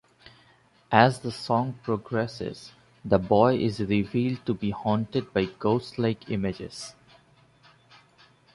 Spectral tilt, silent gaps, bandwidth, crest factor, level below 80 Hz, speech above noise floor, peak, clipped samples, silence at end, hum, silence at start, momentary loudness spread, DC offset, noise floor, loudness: -7 dB/octave; none; 11.5 kHz; 24 dB; -54 dBFS; 35 dB; -4 dBFS; under 0.1%; 1.65 s; none; 0.9 s; 16 LU; under 0.1%; -60 dBFS; -26 LUFS